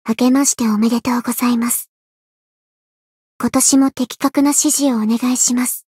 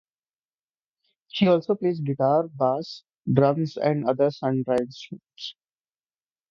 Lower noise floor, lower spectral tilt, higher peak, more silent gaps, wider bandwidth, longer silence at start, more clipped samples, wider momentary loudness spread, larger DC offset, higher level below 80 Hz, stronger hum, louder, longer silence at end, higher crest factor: about the same, under -90 dBFS vs under -90 dBFS; second, -3 dB/octave vs -8 dB/octave; first, 0 dBFS vs -4 dBFS; first, 1.88-3.39 s vs none; first, 16.5 kHz vs 7.4 kHz; second, 0.05 s vs 1.35 s; neither; second, 7 LU vs 16 LU; neither; about the same, -60 dBFS vs -64 dBFS; neither; first, -15 LUFS vs -24 LUFS; second, 0.15 s vs 1 s; second, 16 dB vs 22 dB